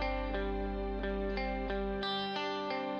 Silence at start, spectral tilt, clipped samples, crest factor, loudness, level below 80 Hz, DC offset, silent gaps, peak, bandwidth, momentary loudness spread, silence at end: 0 s; -6.5 dB/octave; under 0.1%; 12 dB; -36 LUFS; -42 dBFS; under 0.1%; none; -22 dBFS; 6.6 kHz; 2 LU; 0 s